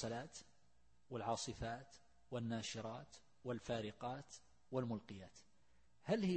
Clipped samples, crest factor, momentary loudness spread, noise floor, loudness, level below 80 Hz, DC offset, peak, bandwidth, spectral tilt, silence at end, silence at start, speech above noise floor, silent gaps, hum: under 0.1%; 20 dB; 17 LU; -77 dBFS; -47 LUFS; -68 dBFS; under 0.1%; -26 dBFS; 8.4 kHz; -5 dB/octave; 0 s; 0 s; 32 dB; none; none